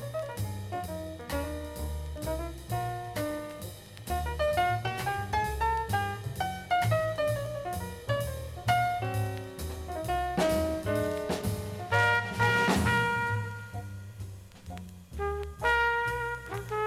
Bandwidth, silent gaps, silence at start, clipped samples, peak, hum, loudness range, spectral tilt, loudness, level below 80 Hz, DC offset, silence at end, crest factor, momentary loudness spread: 16.5 kHz; none; 0 s; under 0.1%; -14 dBFS; none; 8 LU; -5 dB/octave; -31 LUFS; -44 dBFS; under 0.1%; 0 s; 18 dB; 15 LU